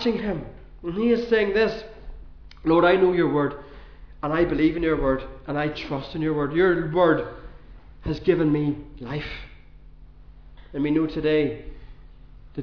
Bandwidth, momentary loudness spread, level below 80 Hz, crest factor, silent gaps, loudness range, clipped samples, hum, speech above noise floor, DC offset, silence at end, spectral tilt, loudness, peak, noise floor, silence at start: 5.4 kHz; 17 LU; -42 dBFS; 18 dB; none; 6 LU; under 0.1%; none; 24 dB; 0.3%; 0 s; -8 dB/octave; -23 LUFS; -6 dBFS; -46 dBFS; 0 s